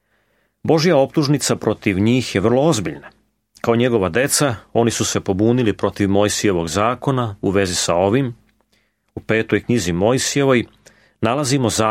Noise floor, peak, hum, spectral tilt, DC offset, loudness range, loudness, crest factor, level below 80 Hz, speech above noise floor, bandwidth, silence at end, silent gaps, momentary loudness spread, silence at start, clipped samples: -64 dBFS; -2 dBFS; none; -5 dB/octave; under 0.1%; 2 LU; -18 LUFS; 16 dB; -48 dBFS; 47 dB; 16.5 kHz; 0 s; none; 5 LU; 0.65 s; under 0.1%